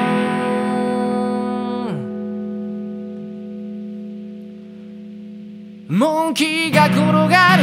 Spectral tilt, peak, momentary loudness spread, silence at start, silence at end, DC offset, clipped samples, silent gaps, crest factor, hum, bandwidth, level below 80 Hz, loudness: -5.5 dB/octave; 0 dBFS; 21 LU; 0 s; 0 s; under 0.1%; under 0.1%; none; 18 dB; none; 16 kHz; -64 dBFS; -18 LUFS